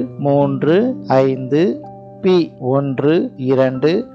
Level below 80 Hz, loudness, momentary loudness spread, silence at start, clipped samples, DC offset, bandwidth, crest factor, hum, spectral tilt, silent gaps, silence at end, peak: -58 dBFS; -16 LUFS; 4 LU; 0 s; under 0.1%; under 0.1%; 7 kHz; 16 dB; none; -8.5 dB/octave; none; 0 s; 0 dBFS